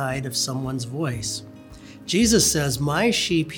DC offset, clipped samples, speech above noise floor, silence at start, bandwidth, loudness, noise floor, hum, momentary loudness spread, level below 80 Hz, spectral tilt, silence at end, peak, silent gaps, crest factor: under 0.1%; under 0.1%; 20 dB; 0 s; over 20 kHz; -22 LUFS; -43 dBFS; none; 12 LU; -44 dBFS; -3.5 dB/octave; 0 s; -4 dBFS; none; 18 dB